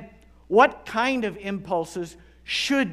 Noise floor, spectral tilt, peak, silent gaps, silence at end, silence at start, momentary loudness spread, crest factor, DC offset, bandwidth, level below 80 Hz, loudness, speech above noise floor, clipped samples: -47 dBFS; -4 dB/octave; -2 dBFS; none; 0 s; 0 s; 15 LU; 22 dB; under 0.1%; 15 kHz; -54 dBFS; -24 LUFS; 24 dB; under 0.1%